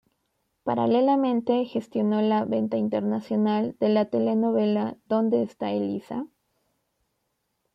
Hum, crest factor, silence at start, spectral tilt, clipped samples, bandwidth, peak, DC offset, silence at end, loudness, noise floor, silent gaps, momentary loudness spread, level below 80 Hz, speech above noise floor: none; 14 dB; 0.65 s; -8.5 dB/octave; under 0.1%; 5.8 kHz; -12 dBFS; under 0.1%; 1.5 s; -25 LUFS; -77 dBFS; none; 8 LU; -72 dBFS; 53 dB